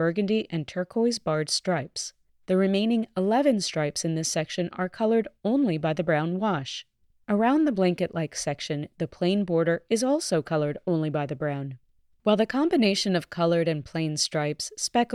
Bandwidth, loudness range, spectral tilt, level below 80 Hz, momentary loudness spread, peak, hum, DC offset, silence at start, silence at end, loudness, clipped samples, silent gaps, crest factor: 14 kHz; 1 LU; -5 dB/octave; -64 dBFS; 8 LU; -10 dBFS; none; under 0.1%; 0 s; 0 s; -26 LUFS; under 0.1%; none; 16 dB